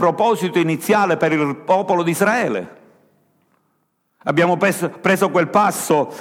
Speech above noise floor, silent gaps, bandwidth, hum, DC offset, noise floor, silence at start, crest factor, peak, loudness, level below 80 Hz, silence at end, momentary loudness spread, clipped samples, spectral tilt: 50 dB; none; 17 kHz; none; under 0.1%; -67 dBFS; 0 s; 16 dB; -2 dBFS; -17 LUFS; -68 dBFS; 0 s; 5 LU; under 0.1%; -5 dB/octave